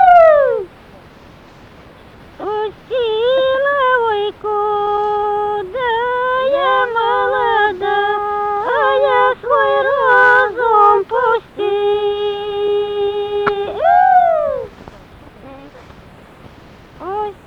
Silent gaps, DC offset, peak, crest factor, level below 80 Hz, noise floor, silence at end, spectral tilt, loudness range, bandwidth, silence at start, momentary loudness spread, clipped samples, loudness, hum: none; under 0.1%; -2 dBFS; 14 dB; -48 dBFS; -41 dBFS; 0.15 s; -5 dB/octave; 5 LU; 7.2 kHz; 0 s; 11 LU; under 0.1%; -15 LUFS; none